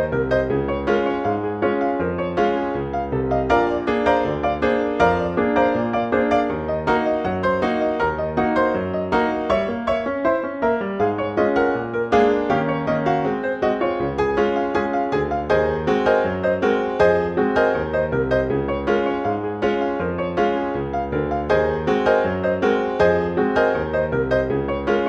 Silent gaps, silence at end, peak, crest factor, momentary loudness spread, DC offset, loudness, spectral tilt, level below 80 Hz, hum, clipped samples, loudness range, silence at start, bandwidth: none; 0 s; -4 dBFS; 16 dB; 5 LU; under 0.1%; -20 LUFS; -7.5 dB/octave; -40 dBFS; none; under 0.1%; 2 LU; 0 s; 7.8 kHz